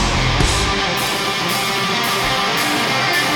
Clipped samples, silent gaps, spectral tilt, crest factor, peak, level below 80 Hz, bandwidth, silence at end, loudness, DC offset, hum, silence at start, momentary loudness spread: under 0.1%; none; -3 dB/octave; 16 dB; 0 dBFS; -28 dBFS; 19.5 kHz; 0 s; -16 LUFS; under 0.1%; none; 0 s; 2 LU